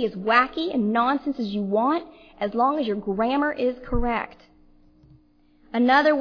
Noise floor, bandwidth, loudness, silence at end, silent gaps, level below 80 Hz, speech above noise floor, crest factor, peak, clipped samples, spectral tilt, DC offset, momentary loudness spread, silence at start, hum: -58 dBFS; 5.4 kHz; -23 LUFS; 0 s; none; -40 dBFS; 35 dB; 20 dB; -4 dBFS; under 0.1%; -7 dB/octave; under 0.1%; 9 LU; 0 s; 60 Hz at -50 dBFS